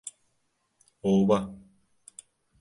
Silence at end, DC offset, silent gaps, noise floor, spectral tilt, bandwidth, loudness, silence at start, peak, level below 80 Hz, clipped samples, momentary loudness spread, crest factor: 1.05 s; under 0.1%; none; -75 dBFS; -7 dB/octave; 11.5 kHz; -25 LUFS; 0.05 s; -10 dBFS; -60 dBFS; under 0.1%; 25 LU; 20 dB